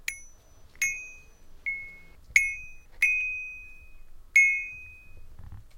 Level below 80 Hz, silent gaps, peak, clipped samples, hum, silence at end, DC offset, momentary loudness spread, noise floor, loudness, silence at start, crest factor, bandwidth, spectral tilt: -50 dBFS; none; -4 dBFS; under 0.1%; none; 0 s; under 0.1%; 24 LU; -52 dBFS; -25 LUFS; 0.1 s; 28 dB; 16.5 kHz; 0.5 dB/octave